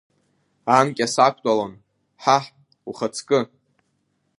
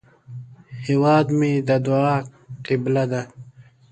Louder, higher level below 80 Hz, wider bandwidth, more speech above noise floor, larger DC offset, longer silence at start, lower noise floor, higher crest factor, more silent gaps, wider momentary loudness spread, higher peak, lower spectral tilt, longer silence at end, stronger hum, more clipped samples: about the same, -21 LUFS vs -20 LUFS; second, -70 dBFS vs -60 dBFS; first, 11.5 kHz vs 9 kHz; first, 50 dB vs 27 dB; neither; first, 0.65 s vs 0.3 s; first, -70 dBFS vs -46 dBFS; about the same, 22 dB vs 18 dB; neither; second, 17 LU vs 22 LU; first, 0 dBFS vs -4 dBFS; second, -4 dB/octave vs -8 dB/octave; first, 0.95 s vs 0.3 s; neither; neither